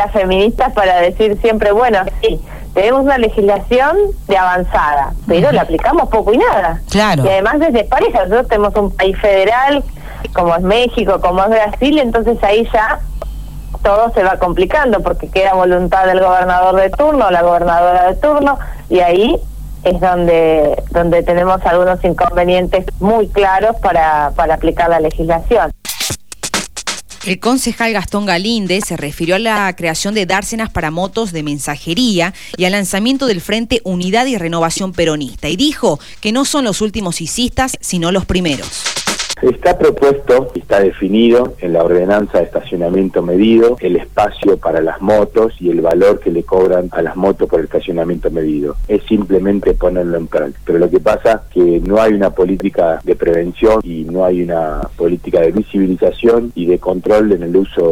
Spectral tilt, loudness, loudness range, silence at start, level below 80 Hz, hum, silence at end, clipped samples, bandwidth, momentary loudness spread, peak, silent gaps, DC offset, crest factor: -5 dB/octave; -13 LUFS; 4 LU; 0 s; -28 dBFS; none; 0 s; under 0.1%; 19.5 kHz; 7 LU; 0 dBFS; none; 2%; 12 dB